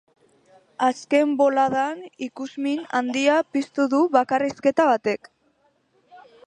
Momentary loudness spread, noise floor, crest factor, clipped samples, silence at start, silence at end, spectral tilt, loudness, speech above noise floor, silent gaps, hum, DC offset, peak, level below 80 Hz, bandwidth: 11 LU; -65 dBFS; 20 dB; under 0.1%; 0.8 s; 0.3 s; -4.5 dB/octave; -22 LUFS; 43 dB; none; none; under 0.1%; -4 dBFS; -70 dBFS; 10.5 kHz